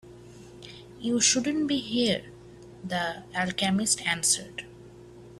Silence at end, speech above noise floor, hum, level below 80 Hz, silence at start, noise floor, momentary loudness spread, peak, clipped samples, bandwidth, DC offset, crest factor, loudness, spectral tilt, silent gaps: 0 s; 21 dB; none; -60 dBFS; 0.05 s; -48 dBFS; 23 LU; -10 dBFS; under 0.1%; 14.5 kHz; under 0.1%; 20 dB; -26 LUFS; -2.5 dB/octave; none